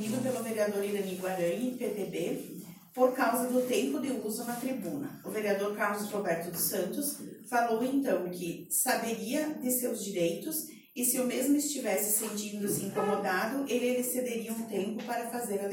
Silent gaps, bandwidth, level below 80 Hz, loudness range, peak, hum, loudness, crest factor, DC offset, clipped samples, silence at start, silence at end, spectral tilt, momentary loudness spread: none; 17 kHz; -76 dBFS; 2 LU; -14 dBFS; none; -31 LUFS; 18 dB; under 0.1%; under 0.1%; 0 s; 0 s; -3.5 dB/octave; 7 LU